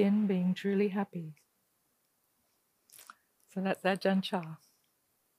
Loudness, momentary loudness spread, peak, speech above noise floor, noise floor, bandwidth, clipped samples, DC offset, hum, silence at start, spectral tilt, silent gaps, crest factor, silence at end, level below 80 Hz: -32 LUFS; 20 LU; -14 dBFS; 45 dB; -76 dBFS; 15 kHz; under 0.1%; under 0.1%; none; 0 s; -7 dB/octave; none; 20 dB; 0.85 s; -84 dBFS